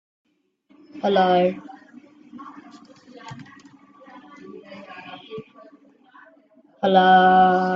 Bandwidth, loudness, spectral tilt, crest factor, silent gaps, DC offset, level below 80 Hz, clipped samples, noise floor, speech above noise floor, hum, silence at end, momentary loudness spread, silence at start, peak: 7 kHz; -17 LUFS; -7 dB/octave; 20 dB; none; under 0.1%; -68 dBFS; under 0.1%; -62 dBFS; 46 dB; none; 0 s; 28 LU; 0.95 s; -2 dBFS